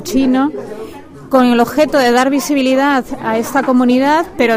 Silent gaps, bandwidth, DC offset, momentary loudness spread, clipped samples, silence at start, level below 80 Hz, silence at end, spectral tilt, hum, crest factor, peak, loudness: none; 16 kHz; under 0.1%; 8 LU; under 0.1%; 0 s; -44 dBFS; 0 s; -4 dB/octave; none; 12 dB; 0 dBFS; -13 LUFS